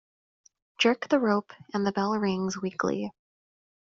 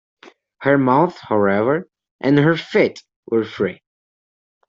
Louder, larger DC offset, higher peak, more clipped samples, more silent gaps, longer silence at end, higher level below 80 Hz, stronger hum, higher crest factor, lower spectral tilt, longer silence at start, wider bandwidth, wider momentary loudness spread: second, -27 LUFS vs -18 LUFS; neither; second, -8 dBFS vs -2 dBFS; neither; second, none vs 2.11-2.19 s, 3.16-3.23 s; second, 0.75 s vs 0.95 s; second, -68 dBFS vs -60 dBFS; neither; about the same, 20 dB vs 16 dB; second, -4 dB/octave vs -8 dB/octave; first, 0.8 s vs 0.6 s; about the same, 7.6 kHz vs 7.4 kHz; about the same, 8 LU vs 9 LU